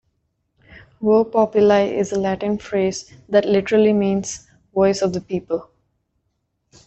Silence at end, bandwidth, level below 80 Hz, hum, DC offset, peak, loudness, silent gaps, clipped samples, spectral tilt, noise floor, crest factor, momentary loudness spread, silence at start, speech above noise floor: 1.25 s; 8.2 kHz; -54 dBFS; none; under 0.1%; -4 dBFS; -19 LUFS; none; under 0.1%; -5.5 dB/octave; -72 dBFS; 16 dB; 12 LU; 1 s; 54 dB